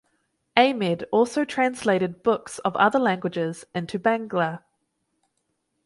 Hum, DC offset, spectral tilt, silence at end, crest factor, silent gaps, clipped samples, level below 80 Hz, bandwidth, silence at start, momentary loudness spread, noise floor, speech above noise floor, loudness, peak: none; under 0.1%; -5.5 dB/octave; 1.3 s; 22 dB; none; under 0.1%; -66 dBFS; 11.5 kHz; 0.55 s; 9 LU; -75 dBFS; 52 dB; -23 LUFS; -2 dBFS